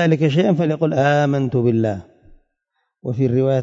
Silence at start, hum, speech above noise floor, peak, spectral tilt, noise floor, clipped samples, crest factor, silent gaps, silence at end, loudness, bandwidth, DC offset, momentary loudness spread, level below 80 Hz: 0 s; none; 56 dB; -4 dBFS; -8 dB/octave; -73 dBFS; under 0.1%; 14 dB; none; 0 s; -18 LUFS; 7.6 kHz; under 0.1%; 9 LU; -56 dBFS